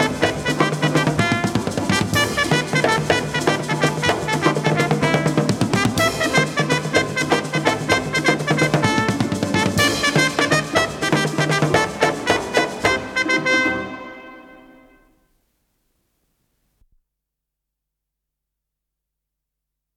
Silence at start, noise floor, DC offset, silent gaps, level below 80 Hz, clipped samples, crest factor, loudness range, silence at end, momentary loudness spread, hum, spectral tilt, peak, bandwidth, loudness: 0 s; -82 dBFS; under 0.1%; none; -48 dBFS; under 0.1%; 20 dB; 4 LU; 5.35 s; 4 LU; none; -4.5 dB/octave; -2 dBFS; 16.5 kHz; -18 LUFS